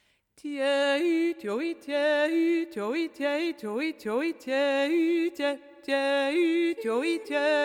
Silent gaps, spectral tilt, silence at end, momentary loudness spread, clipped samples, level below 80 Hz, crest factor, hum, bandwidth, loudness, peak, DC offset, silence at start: none; -4 dB/octave; 0 s; 7 LU; under 0.1%; -80 dBFS; 12 dB; none; 15 kHz; -27 LUFS; -14 dBFS; under 0.1%; 0.45 s